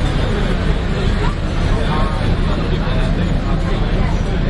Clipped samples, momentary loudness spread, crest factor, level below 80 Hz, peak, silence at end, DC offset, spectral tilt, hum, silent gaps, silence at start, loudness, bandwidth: under 0.1%; 1 LU; 14 dB; -18 dBFS; -2 dBFS; 0 s; under 0.1%; -7 dB/octave; none; none; 0 s; -19 LUFS; 11 kHz